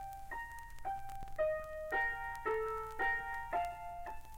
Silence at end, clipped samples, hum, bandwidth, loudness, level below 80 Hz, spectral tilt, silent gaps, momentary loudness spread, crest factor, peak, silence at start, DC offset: 0 s; under 0.1%; none; 17 kHz; -39 LUFS; -54 dBFS; -4.5 dB/octave; none; 11 LU; 14 dB; -24 dBFS; 0 s; under 0.1%